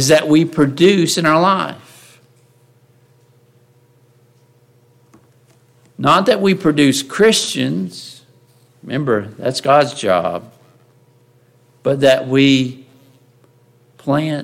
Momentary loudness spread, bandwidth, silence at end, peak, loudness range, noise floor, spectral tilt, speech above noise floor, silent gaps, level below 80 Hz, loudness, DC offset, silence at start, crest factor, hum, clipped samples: 13 LU; 16 kHz; 0 s; 0 dBFS; 4 LU; -53 dBFS; -4.5 dB/octave; 38 dB; none; -58 dBFS; -15 LUFS; under 0.1%; 0 s; 16 dB; none; under 0.1%